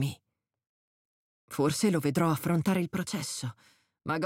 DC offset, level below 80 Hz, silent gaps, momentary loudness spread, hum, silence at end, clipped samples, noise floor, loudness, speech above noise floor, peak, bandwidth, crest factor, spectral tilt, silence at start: under 0.1%; -66 dBFS; 0.69-1.48 s; 13 LU; none; 0 s; under 0.1%; -79 dBFS; -30 LUFS; 51 dB; -14 dBFS; 17 kHz; 16 dB; -5.5 dB/octave; 0 s